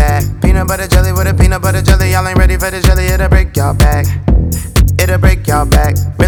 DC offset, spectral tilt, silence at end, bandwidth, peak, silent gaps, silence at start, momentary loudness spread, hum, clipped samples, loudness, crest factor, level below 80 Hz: under 0.1%; -5.5 dB/octave; 0 s; over 20 kHz; 0 dBFS; none; 0 s; 3 LU; none; 0.7%; -11 LUFS; 10 dB; -12 dBFS